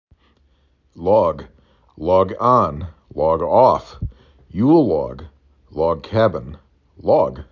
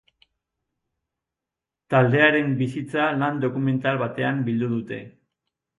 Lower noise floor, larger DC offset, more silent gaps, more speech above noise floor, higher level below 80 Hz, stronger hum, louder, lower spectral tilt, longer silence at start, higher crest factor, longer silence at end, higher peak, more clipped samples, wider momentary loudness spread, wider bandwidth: second, -59 dBFS vs -87 dBFS; neither; neither; second, 42 dB vs 65 dB; first, -40 dBFS vs -64 dBFS; neither; first, -17 LUFS vs -22 LUFS; about the same, -9 dB/octave vs -8 dB/octave; second, 0.95 s vs 1.9 s; about the same, 18 dB vs 20 dB; second, 0.1 s vs 0.7 s; about the same, -2 dBFS vs -4 dBFS; neither; first, 18 LU vs 9 LU; second, 7 kHz vs 11 kHz